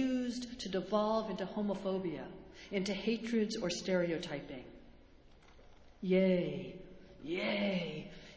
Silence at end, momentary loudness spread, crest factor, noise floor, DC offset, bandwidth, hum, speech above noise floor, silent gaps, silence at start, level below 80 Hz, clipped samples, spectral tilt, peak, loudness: 0 s; 17 LU; 18 dB; -60 dBFS; under 0.1%; 8 kHz; none; 24 dB; none; 0 s; -64 dBFS; under 0.1%; -5.5 dB/octave; -18 dBFS; -36 LUFS